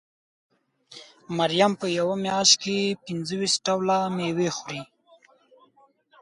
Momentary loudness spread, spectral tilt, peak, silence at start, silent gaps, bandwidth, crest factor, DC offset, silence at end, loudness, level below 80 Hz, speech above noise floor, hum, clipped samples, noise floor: 15 LU; -3 dB/octave; -2 dBFS; 0.9 s; none; 11.5 kHz; 24 dB; under 0.1%; 1.35 s; -23 LUFS; -68 dBFS; 37 dB; none; under 0.1%; -61 dBFS